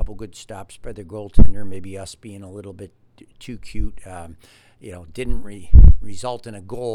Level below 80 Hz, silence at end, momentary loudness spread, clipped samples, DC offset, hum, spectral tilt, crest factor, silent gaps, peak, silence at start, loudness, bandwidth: -20 dBFS; 0 s; 24 LU; 0.5%; under 0.1%; none; -7.5 dB/octave; 16 dB; none; 0 dBFS; 0 s; -20 LUFS; 11 kHz